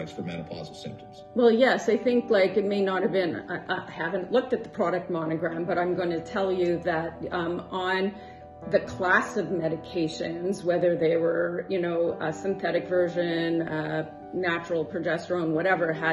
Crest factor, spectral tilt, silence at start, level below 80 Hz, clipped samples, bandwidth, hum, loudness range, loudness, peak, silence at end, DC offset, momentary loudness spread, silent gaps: 18 dB; -6 dB/octave; 0 s; -60 dBFS; under 0.1%; 11.5 kHz; none; 3 LU; -27 LUFS; -8 dBFS; 0 s; under 0.1%; 10 LU; none